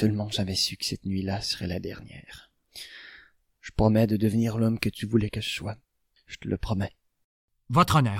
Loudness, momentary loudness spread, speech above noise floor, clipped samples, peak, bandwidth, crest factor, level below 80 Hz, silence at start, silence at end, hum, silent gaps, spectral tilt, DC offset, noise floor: -27 LUFS; 22 LU; 30 dB; under 0.1%; -6 dBFS; 16.5 kHz; 22 dB; -46 dBFS; 0 s; 0 s; none; 7.24-7.48 s; -5.5 dB/octave; under 0.1%; -56 dBFS